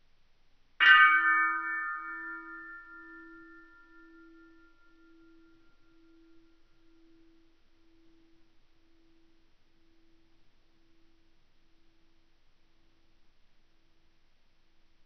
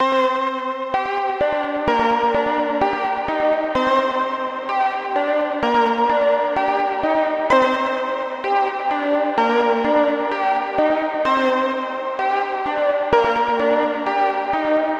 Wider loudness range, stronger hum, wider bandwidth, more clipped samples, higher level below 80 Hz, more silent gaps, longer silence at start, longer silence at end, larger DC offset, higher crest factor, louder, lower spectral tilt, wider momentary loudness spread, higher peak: first, 26 LU vs 1 LU; neither; second, 6.4 kHz vs 8.4 kHz; neither; second, -66 dBFS vs -52 dBFS; neither; first, 0.8 s vs 0 s; first, 12.1 s vs 0 s; neither; first, 28 dB vs 14 dB; second, -24 LUFS vs -19 LUFS; second, 4.5 dB/octave vs -5 dB/octave; first, 30 LU vs 5 LU; second, -8 dBFS vs -4 dBFS